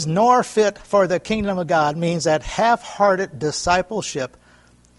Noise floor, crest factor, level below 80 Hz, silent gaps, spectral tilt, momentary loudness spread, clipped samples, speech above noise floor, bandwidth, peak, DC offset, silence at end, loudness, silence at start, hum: -52 dBFS; 16 dB; -44 dBFS; none; -4.5 dB/octave; 9 LU; under 0.1%; 33 dB; 11.5 kHz; -2 dBFS; under 0.1%; 0.7 s; -19 LUFS; 0 s; none